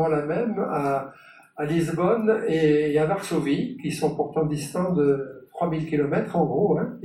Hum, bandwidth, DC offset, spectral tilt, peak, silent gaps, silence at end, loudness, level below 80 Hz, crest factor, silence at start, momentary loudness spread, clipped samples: none; 13.5 kHz; under 0.1%; -7 dB/octave; -8 dBFS; none; 0 s; -24 LUFS; -56 dBFS; 16 dB; 0 s; 8 LU; under 0.1%